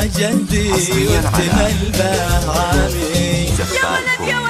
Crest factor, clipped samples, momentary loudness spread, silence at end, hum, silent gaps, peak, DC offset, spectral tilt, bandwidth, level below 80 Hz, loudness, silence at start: 14 dB; under 0.1%; 2 LU; 0 s; none; none; -2 dBFS; under 0.1%; -4.5 dB/octave; 15.5 kHz; -24 dBFS; -16 LUFS; 0 s